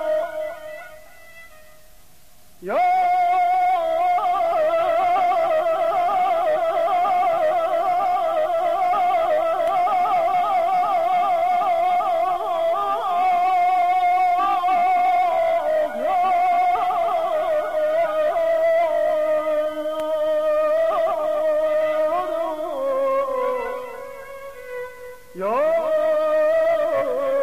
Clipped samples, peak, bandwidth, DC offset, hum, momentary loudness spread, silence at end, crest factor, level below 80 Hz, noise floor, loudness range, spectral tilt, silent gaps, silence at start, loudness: under 0.1%; -12 dBFS; 15 kHz; 0.6%; none; 7 LU; 0 s; 8 dB; -58 dBFS; -53 dBFS; 5 LU; -4 dB/octave; none; 0 s; -20 LUFS